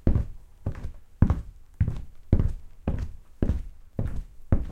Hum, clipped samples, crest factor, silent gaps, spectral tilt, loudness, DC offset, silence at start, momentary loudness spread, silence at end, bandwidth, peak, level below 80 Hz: none; under 0.1%; 22 dB; none; -10 dB/octave; -30 LUFS; under 0.1%; 0.05 s; 15 LU; 0 s; 4.7 kHz; -4 dBFS; -30 dBFS